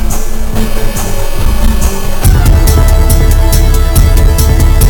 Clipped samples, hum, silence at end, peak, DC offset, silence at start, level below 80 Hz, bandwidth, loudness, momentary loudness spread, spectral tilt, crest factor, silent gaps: 3%; none; 0 s; 0 dBFS; under 0.1%; 0 s; -8 dBFS; 19.5 kHz; -11 LUFS; 8 LU; -5 dB/octave; 6 dB; none